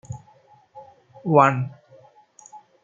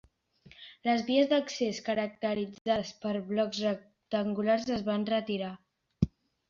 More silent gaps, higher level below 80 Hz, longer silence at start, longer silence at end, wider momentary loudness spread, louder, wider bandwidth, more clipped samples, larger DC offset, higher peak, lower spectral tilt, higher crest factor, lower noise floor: second, none vs 2.61-2.65 s; second, -66 dBFS vs -56 dBFS; second, 0.1 s vs 0.45 s; second, 0.25 s vs 0.4 s; first, 23 LU vs 9 LU; first, -20 LUFS vs -31 LUFS; about the same, 7.6 kHz vs 7.4 kHz; neither; neither; first, -2 dBFS vs -12 dBFS; first, -7.5 dB/octave vs -5.5 dB/octave; about the same, 24 dB vs 20 dB; second, -55 dBFS vs -60 dBFS